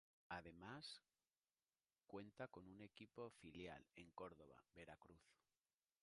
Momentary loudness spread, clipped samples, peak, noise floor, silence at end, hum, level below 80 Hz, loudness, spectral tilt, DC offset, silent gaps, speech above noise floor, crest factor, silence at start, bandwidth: 8 LU; under 0.1%; -38 dBFS; under -90 dBFS; 0.7 s; none; -82 dBFS; -60 LUFS; -5 dB/octave; under 0.1%; 1.38-1.42 s; over 30 dB; 24 dB; 0.3 s; 11 kHz